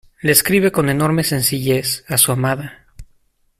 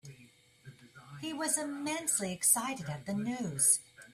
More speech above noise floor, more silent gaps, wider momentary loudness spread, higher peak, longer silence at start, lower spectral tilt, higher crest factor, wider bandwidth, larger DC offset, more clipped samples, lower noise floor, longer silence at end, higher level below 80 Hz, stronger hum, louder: first, 41 dB vs 28 dB; neither; second, 7 LU vs 13 LU; first, 0 dBFS vs -14 dBFS; first, 0.25 s vs 0.05 s; first, -4 dB/octave vs -2.5 dB/octave; about the same, 18 dB vs 22 dB; about the same, 16 kHz vs 16 kHz; neither; neither; about the same, -58 dBFS vs -61 dBFS; first, 0.55 s vs 0 s; first, -46 dBFS vs -72 dBFS; neither; first, -16 LUFS vs -31 LUFS